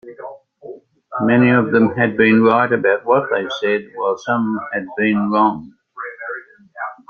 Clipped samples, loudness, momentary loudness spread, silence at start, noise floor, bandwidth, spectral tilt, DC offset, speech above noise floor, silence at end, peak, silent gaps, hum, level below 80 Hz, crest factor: under 0.1%; -16 LUFS; 19 LU; 0.05 s; -38 dBFS; 6.8 kHz; -7.5 dB/octave; under 0.1%; 22 dB; 0.15 s; 0 dBFS; none; none; -60 dBFS; 16 dB